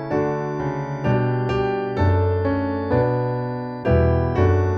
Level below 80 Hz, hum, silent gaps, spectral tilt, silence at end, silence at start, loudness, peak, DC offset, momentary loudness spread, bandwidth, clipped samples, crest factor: -34 dBFS; none; none; -9 dB/octave; 0 s; 0 s; -21 LUFS; -6 dBFS; under 0.1%; 7 LU; 6.2 kHz; under 0.1%; 14 dB